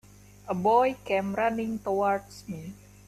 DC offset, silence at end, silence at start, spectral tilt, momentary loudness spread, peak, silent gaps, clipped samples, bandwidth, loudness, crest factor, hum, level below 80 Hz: under 0.1%; 0.3 s; 0.45 s; -6.5 dB/octave; 17 LU; -10 dBFS; none; under 0.1%; 14.5 kHz; -27 LUFS; 18 dB; 50 Hz at -50 dBFS; -58 dBFS